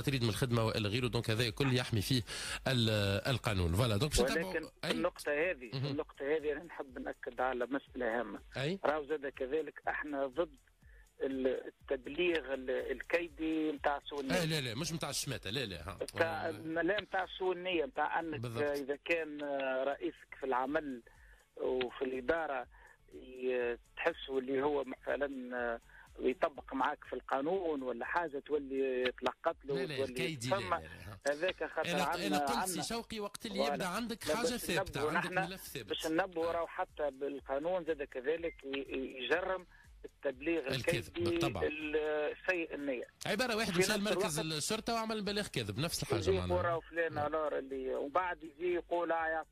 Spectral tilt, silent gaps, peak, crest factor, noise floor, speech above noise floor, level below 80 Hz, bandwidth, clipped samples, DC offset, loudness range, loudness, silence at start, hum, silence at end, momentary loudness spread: -4.5 dB/octave; none; -18 dBFS; 18 dB; -61 dBFS; 25 dB; -58 dBFS; 15.5 kHz; under 0.1%; under 0.1%; 4 LU; -36 LUFS; 0 s; none; 0.05 s; 7 LU